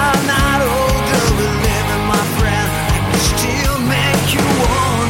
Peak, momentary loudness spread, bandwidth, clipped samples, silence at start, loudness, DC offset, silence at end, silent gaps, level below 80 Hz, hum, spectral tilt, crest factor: 0 dBFS; 2 LU; 16.5 kHz; under 0.1%; 0 s; -15 LUFS; under 0.1%; 0 s; none; -24 dBFS; none; -4.5 dB/octave; 14 dB